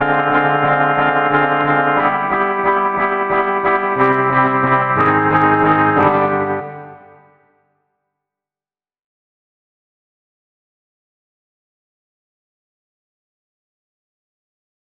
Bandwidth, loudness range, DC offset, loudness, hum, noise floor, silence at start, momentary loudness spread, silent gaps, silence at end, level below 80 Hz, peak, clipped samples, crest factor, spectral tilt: 5.2 kHz; 7 LU; under 0.1%; -14 LUFS; none; under -90 dBFS; 0 s; 4 LU; none; 8 s; -52 dBFS; 0 dBFS; under 0.1%; 18 dB; -9 dB/octave